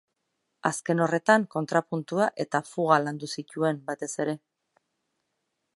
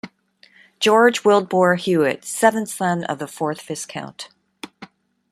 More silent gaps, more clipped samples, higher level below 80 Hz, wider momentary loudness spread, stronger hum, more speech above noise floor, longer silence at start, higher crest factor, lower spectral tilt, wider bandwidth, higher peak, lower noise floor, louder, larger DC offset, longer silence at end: neither; neither; second, -80 dBFS vs -68 dBFS; second, 10 LU vs 23 LU; neither; first, 53 dB vs 36 dB; first, 0.65 s vs 0.05 s; first, 24 dB vs 18 dB; about the same, -5 dB/octave vs -4.5 dB/octave; second, 11.5 kHz vs 14.5 kHz; about the same, -4 dBFS vs -2 dBFS; first, -80 dBFS vs -55 dBFS; second, -27 LUFS vs -19 LUFS; neither; first, 1.4 s vs 0.45 s